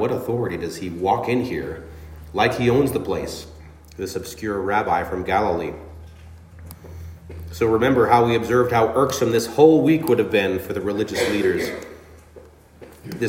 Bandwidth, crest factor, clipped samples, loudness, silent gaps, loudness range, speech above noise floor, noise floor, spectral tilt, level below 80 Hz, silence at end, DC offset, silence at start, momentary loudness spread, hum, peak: 16.5 kHz; 20 dB; under 0.1%; -20 LUFS; none; 8 LU; 26 dB; -46 dBFS; -5.5 dB/octave; -48 dBFS; 0 s; under 0.1%; 0 s; 22 LU; none; -2 dBFS